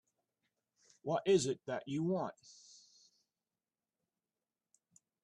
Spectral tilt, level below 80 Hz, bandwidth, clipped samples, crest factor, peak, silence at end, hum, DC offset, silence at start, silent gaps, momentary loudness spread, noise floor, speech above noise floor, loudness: -5.5 dB/octave; -80 dBFS; 10.5 kHz; under 0.1%; 22 dB; -20 dBFS; 2.9 s; none; under 0.1%; 1.05 s; none; 25 LU; under -90 dBFS; over 54 dB; -36 LUFS